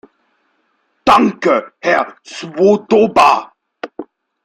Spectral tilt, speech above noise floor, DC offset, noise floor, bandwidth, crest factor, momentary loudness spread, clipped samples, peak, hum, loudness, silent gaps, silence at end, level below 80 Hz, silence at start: -5 dB/octave; 50 dB; under 0.1%; -63 dBFS; 15 kHz; 16 dB; 19 LU; under 0.1%; 0 dBFS; none; -13 LUFS; none; 0.4 s; -52 dBFS; 1.05 s